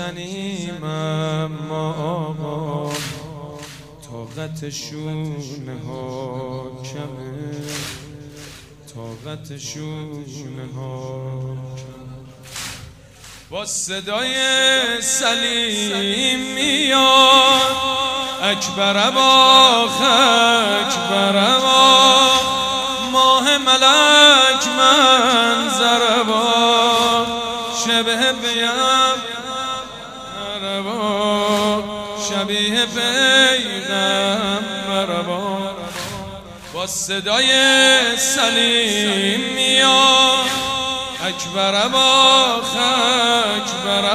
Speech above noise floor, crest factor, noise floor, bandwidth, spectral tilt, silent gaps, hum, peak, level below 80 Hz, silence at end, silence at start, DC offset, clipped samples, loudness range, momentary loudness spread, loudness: 25 dB; 18 dB; -41 dBFS; 16 kHz; -2 dB/octave; none; none; 0 dBFS; -52 dBFS; 0 s; 0 s; under 0.1%; under 0.1%; 19 LU; 21 LU; -14 LUFS